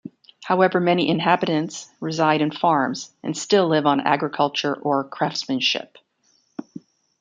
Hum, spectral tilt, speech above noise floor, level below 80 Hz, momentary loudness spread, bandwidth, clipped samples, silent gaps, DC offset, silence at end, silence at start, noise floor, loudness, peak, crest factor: none; -5 dB/octave; 44 dB; -68 dBFS; 13 LU; 9.4 kHz; under 0.1%; none; under 0.1%; 0.6 s; 0.05 s; -64 dBFS; -21 LUFS; -2 dBFS; 20 dB